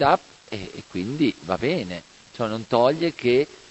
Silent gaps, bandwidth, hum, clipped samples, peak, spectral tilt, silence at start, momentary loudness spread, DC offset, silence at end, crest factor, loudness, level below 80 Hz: none; 8.4 kHz; none; under 0.1%; -4 dBFS; -6 dB/octave; 0 s; 15 LU; under 0.1%; 0.15 s; 20 dB; -24 LUFS; -54 dBFS